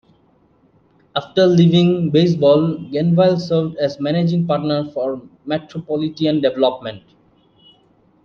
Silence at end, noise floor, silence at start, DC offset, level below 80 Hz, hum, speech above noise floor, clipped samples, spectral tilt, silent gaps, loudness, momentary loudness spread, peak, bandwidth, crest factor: 1.25 s; -56 dBFS; 1.15 s; under 0.1%; -58 dBFS; none; 40 dB; under 0.1%; -8 dB/octave; none; -17 LUFS; 12 LU; -2 dBFS; 6.8 kHz; 16 dB